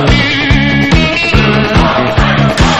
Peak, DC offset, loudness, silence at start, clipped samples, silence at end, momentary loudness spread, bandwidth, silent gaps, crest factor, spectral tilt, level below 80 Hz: 0 dBFS; 2%; -9 LUFS; 0 s; 0.8%; 0 s; 1 LU; 10.5 kHz; none; 8 dB; -5.5 dB/octave; -18 dBFS